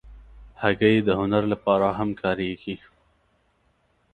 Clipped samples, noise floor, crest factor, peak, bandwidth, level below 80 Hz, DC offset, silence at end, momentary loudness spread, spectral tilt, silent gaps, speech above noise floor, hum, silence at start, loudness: under 0.1%; -66 dBFS; 22 dB; -4 dBFS; 9.2 kHz; -50 dBFS; under 0.1%; 1.35 s; 13 LU; -8.5 dB/octave; none; 44 dB; none; 0.05 s; -23 LUFS